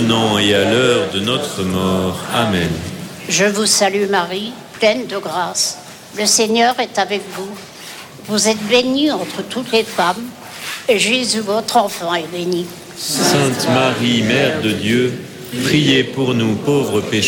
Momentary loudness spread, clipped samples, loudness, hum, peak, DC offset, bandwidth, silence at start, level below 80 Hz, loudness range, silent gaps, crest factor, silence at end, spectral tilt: 14 LU; under 0.1%; -16 LUFS; none; -2 dBFS; under 0.1%; 17.5 kHz; 0 s; -50 dBFS; 2 LU; none; 14 dB; 0 s; -3.5 dB/octave